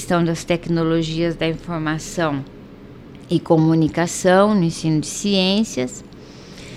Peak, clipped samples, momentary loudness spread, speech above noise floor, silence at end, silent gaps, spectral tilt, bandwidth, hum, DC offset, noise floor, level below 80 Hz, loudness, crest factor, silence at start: -2 dBFS; under 0.1%; 15 LU; 21 dB; 0 s; none; -5.5 dB/octave; 13.5 kHz; none; under 0.1%; -39 dBFS; -44 dBFS; -19 LUFS; 18 dB; 0 s